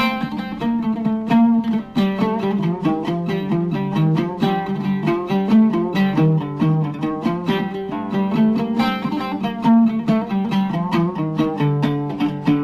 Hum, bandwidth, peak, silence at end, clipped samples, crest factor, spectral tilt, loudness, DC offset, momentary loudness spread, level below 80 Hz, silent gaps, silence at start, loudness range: none; 13 kHz; -6 dBFS; 0 s; under 0.1%; 14 dB; -8.5 dB/octave; -19 LUFS; under 0.1%; 7 LU; -52 dBFS; none; 0 s; 2 LU